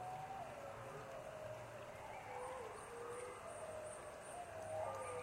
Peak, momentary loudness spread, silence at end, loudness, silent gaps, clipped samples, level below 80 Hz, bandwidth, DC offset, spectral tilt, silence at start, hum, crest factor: -34 dBFS; 6 LU; 0 s; -50 LUFS; none; under 0.1%; -72 dBFS; 16 kHz; under 0.1%; -4 dB/octave; 0 s; none; 16 dB